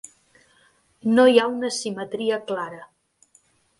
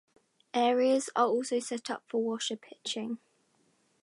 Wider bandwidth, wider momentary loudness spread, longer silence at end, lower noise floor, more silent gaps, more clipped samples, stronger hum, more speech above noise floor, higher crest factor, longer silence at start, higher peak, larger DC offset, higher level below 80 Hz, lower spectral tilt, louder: about the same, 11.5 kHz vs 11.5 kHz; first, 14 LU vs 11 LU; about the same, 0.95 s vs 0.85 s; second, -61 dBFS vs -71 dBFS; neither; neither; neither; about the same, 40 dB vs 41 dB; about the same, 20 dB vs 20 dB; first, 1.05 s vs 0.55 s; first, -4 dBFS vs -12 dBFS; neither; first, -70 dBFS vs -86 dBFS; about the same, -4 dB/octave vs -3 dB/octave; first, -21 LUFS vs -31 LUFS